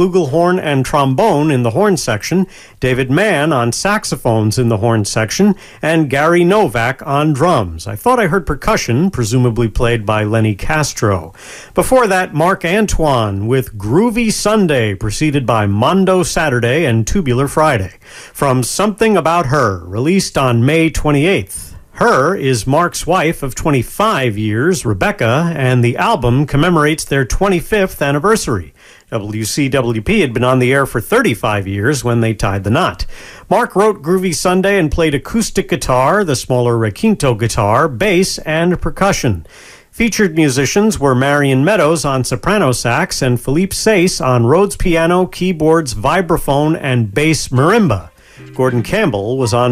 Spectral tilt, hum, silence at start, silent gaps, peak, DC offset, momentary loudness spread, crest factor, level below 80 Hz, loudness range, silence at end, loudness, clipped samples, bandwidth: -5.5 dB/octave; none; 0 s; none; 0 dBFS; under 0.1%; 5 LU; 12 dB; -30 dBFS; 2 LU; 0 s; -14 LUFS; under 0.1%; 16 kHz